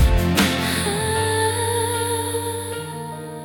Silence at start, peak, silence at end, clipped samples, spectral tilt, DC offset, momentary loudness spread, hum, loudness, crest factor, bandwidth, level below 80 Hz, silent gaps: 0 s; -4 dBFS; 0 s; under 0.1%; -4 dB/octave; under 0.1%; 11 LU; none; -21 LUFS; 16 dB; 18 kHz; -28 dBFS; none